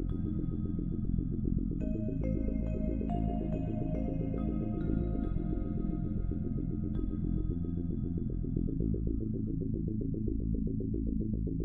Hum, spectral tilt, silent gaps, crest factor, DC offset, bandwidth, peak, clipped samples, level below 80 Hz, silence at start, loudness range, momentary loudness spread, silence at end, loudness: none; -12.5 dB/octave; none; 14 dB; under 0.1%; 3.6 kHz; -18 dBFS; under 0.1%; -38 dBFS; 0 s; 1 LU; 2 LU; 0 s; -35 LUFS